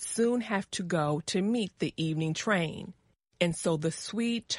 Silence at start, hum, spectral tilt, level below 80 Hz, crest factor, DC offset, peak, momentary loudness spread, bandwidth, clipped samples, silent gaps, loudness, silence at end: 0 s; none; -4.5 dB/octave; -64 dBFS; 20 dB; under 0.1%; -10 dBFS; 5 LU; 11.5 kHz; under 0.1%; none; -30 LUFS; 0 s